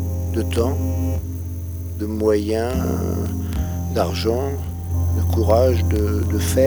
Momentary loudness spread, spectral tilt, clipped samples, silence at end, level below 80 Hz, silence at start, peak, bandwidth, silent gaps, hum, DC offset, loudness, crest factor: 10 LU; -7 dB/octave; under 0.1%; 0 s; -30 dBFS; 0 s; -2 dBFS; over 20 kHz; none; none; under 0.1%; -21 LUFS; 18 dB